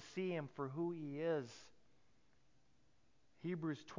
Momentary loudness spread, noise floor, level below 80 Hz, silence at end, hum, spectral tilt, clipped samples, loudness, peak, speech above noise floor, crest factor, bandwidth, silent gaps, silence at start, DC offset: 9 LU; -78 dBFS; -84 dBFS; 0 s; none; -7 dB/octave; under 0.1%; -44 LUFS; -30 dBFS; 34 dB; 16 dB; 7.6 kHz; none; 0 s; under 0.1%